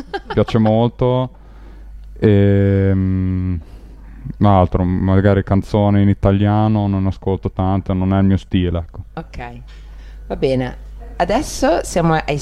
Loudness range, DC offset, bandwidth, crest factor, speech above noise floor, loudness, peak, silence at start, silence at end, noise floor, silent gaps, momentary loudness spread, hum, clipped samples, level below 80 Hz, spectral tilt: 6 LU; under 0.1%; 12 kHz; 16 dB; 21 dB; -16 LUFS; 0 dBFS; 0 s; 0 s; -37 dBFS; none; 16 LU; none; under 0.1%; -32 dBFS; -7.5 dB/octave